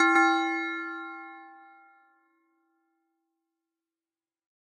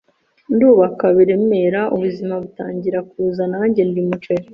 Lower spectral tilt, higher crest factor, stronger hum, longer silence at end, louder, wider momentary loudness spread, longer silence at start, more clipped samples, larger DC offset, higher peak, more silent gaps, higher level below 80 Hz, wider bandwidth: second, -1 dB/octave vs -10 dB/octave; first, 22 dB vs 14 dB; neither; first, 3.05 s vs 0 s; second, -26 LUFS vs -17 LUFS; first, 23 LU vs 11 LU; second, 0 s vs 0.5 s; neither; neither; second, -10 dBFS vs -2 dBFS; neither; second, under -90 dBFS vs -58 dBFS; first, 10.5 kHz vs 5.6 kHz